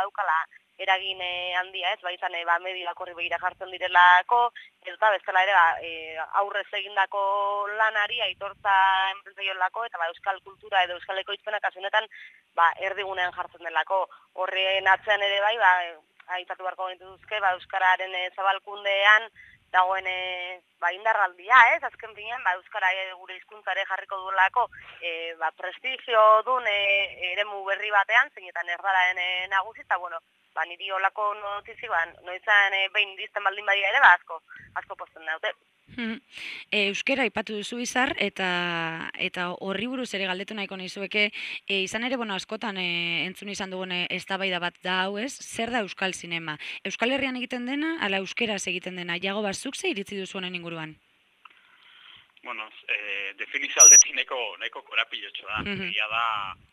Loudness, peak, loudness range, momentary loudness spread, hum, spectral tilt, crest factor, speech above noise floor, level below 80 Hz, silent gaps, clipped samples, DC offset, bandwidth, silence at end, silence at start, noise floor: -24 LUFS; -2 dBFS; 10 LU; 14 LU; none; -0.5 dB/octave; 24 dB; 31 dB; -68 dBFS; none; under 0.1%; under 0.1%; 15 kHz; 0.2 s; 0 s; -56 dBFS